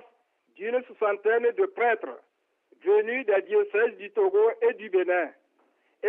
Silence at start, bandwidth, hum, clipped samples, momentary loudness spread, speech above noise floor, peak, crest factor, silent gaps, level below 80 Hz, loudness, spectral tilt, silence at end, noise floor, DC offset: 0.6 s; 3.7 kHz; none; under 0.1%; 8 LU; 43 dB; -12 dBFS; 14 dB; none; -88 dBFS; -25 LUFS; -7 dB/octave; 0 s; -68 dBFS; under 0.1%